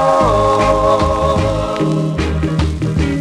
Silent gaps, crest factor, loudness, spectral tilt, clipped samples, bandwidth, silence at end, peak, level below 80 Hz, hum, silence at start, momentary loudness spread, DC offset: none; 12 dB; -15 LUFS; -6.5 dB/octave; under 0.1%; 12 kHz; 0 s; -2 dBFS; -24 dBFS; none; 0 s; 5 LU; under 0.1%